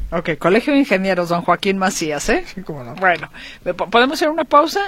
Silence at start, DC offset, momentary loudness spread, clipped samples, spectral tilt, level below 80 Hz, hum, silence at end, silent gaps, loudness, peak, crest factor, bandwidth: 0 s; under 0.1%; 13 LU; under 0.1%; -4.5 dB/octave; -38 dBFS; none; 0 s; none; -17 LUFS; 0 dBFS; 18 dB; 16.5 kHz